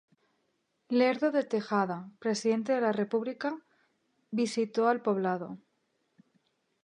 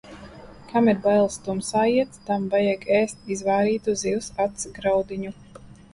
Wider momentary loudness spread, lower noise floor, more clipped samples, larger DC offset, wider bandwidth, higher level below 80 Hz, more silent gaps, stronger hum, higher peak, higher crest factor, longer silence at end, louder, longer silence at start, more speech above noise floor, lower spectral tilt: about the same, 9 LU vs 11 LU; first, -77 dBFS vs -43 dBFS; neither; neither; about the same, 11 kHz vs 11.5 kHz; second, -84 dBFS vs -54 dBFS; neither; neither; second, -12 dBFS vs -8 dBFS; about the same, 18 dB vs 16 dB; first, 1.25 s vs 0.2 s; second, -30 LUFS vs -23 LUFS; first, 0.9 s vs 0.05 s; first, 48 dB vs 21 dB; about the same, -5.5 dB/octave vs -5 dB/octave